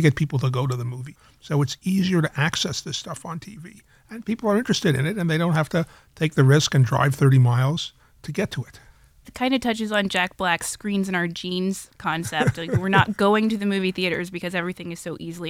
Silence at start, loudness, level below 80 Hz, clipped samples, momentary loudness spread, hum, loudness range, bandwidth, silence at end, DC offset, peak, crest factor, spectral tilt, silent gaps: 0 s; -22 LUFS; -54 dBFS; under 0.1%; 15 LU; none; 5 LU; 15.5 kHz; 0 s; under 0.1%; -2 dBFS; 20 dB; -5.5 dB/octave; none